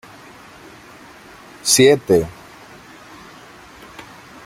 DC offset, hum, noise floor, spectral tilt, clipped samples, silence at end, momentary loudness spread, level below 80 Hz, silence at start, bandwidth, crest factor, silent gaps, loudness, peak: under 0.1%; none; -42 dBFS; -3 dB/octave; under 0.1%; 0.45 s; 29 LU; -52 dBFS; 1.65 s; 16.5 kHz; 22 dB; none; -15 LUFS; 0 dBFS